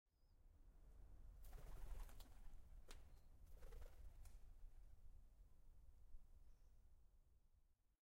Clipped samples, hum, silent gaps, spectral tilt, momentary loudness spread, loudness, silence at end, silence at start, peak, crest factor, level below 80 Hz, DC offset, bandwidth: under 0.1%; none; none; -5 dB/octave; 8 LU; -66 LUFS; 0.25 s; 0.15 s; -42 dBFS; 18 dB; -62 dBFS; under 0.1%; 16 kHz